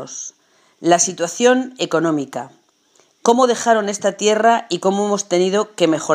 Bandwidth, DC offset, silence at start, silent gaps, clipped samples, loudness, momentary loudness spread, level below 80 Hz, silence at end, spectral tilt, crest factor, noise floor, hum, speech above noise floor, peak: 15.5 kHz; under 0.1%; 0 s; none; under 0.1%; -17 LUFS; 13 LU; -72 dBFS; 0 s; -3.5 dB/octave; 18 dB; -57 dBFS; none; 40 dB; 0 dBFS